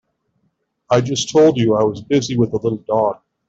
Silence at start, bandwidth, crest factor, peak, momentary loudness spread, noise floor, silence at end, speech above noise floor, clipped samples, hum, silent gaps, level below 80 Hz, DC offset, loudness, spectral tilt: 0.9 s; 8 kHz; 16 dB; -2 dBFS; 6 LU; -68 dBFS; 0.35 s; 52 dB; under 0.1%; none; none; -52 dBFS; under 0.1%; -17 LUFS; -5.5 dB/octave